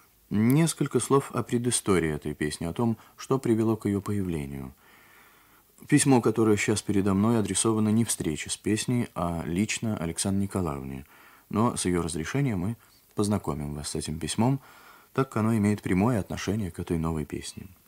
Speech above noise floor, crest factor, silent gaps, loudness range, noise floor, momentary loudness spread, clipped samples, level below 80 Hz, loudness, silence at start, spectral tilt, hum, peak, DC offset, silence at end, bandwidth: 32 dB; 20 dB; none; 5 LU; -59 dBFS; 9 LU; under 0.1%; -50 dBFS; -27 LUFS; 0.3 s; -5.5 dB/octave; none; -8 dBFS; under 0.1%; 0.2 s; 16 kHz